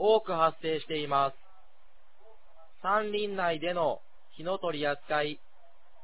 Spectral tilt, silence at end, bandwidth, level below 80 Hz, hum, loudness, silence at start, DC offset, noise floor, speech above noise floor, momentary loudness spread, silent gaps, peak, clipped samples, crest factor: -2.5 dB/octave; 0.7 s; 4 kHz; -70 dBFS; none; -31 LUFS; 0 s; 0.8%; -65 dBFS; 35 dB; 8 LU; none; -12 dBFS; under 0.1%; 20 dB